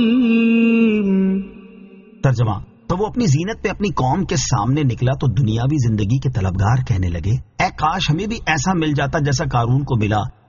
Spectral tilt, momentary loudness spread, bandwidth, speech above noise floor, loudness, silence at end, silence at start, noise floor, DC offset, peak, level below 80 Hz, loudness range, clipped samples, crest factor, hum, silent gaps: -6.5 dB/octave; 7 LU; 7.4 kHz; 24 dB; -18 LUFS; 0.2 s; 0 s; -41 dBFS; under 0.1%; -4 dBFS; -36 dBFS; 2 LU; under 0.1%; 14 dB; none; none